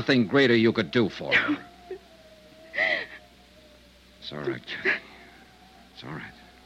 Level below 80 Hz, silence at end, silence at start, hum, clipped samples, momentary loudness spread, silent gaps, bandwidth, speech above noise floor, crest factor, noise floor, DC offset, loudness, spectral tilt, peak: -62 dBFS; 0.35 s; 0 s; none; under 0.1%; 23 LU; none; 11 kHz; 30 dB; 20 dB; -54 dBFS; under 0.1%; -25 LUFS; -6 dB/octave; -8 dBFS